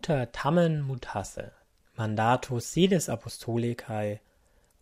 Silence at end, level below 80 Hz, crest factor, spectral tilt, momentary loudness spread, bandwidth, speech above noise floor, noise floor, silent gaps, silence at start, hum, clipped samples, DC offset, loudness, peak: 0.65 s; -56 dBFS; 20 dB; -5.5 dB/octave; 15 LU; 16 kHz; 36 dB; -64 dBFS; none; 0.05 s; none; under 0.1%; under 0.1%; -28 LUFS; -10 dBFS